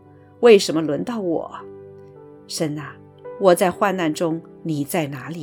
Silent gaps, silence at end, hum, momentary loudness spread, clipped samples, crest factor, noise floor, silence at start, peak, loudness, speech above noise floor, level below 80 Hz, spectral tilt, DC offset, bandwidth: none; 0 s; none; 23 LU; under 0.1%; 20 dB; -43 dBFS; 0.4 s; 0 dBFS; -20 LUFS; 24 dB; -64 dBFS; -5 dB/octave; under 0.1%; 18.5 kHz